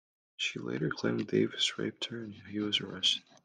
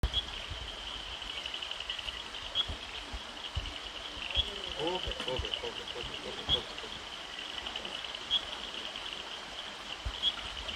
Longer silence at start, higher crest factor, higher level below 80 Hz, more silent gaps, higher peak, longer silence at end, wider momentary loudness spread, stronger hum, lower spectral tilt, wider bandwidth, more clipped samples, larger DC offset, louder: first, 0.4 s vs 0.05 s; about the same, 18 dB vs 22 dB; second, -74 dBFS vs -48 dBFS; neither; about the same, -16 dBFS vs -16 dBFS; first, 0.25 s vs 0 s; about the same, 10 LU vs 9 LU; neither; about the same, -4 dB/octave vs -3 dB/octave; second, 10 kHz vs 16 kHz; neither; neither; first, -32 LUFS vs -36 LUFS